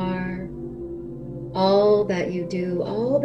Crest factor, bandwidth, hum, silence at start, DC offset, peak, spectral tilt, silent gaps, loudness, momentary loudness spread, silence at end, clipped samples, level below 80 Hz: 16 dB; 8 kHz; none; 0 s; 0.2%; -8 dBFS; -7.5 dB/octave; none; -23 LUFS; 16 LU; 0 s; under 0.1%; -48 dBFS